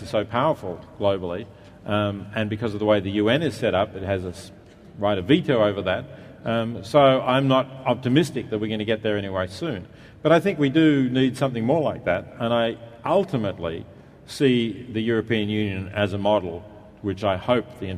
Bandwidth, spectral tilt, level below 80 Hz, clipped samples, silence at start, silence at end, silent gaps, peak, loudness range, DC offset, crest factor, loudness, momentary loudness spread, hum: 13.5 kHz; -7 dB/octave; -56 dBFS; under 0.1%; 0 s; 0 s; none; -2 dBFS; 3 LU; under 0.1%; 20 dB; -23 LUFS; 12 LU; none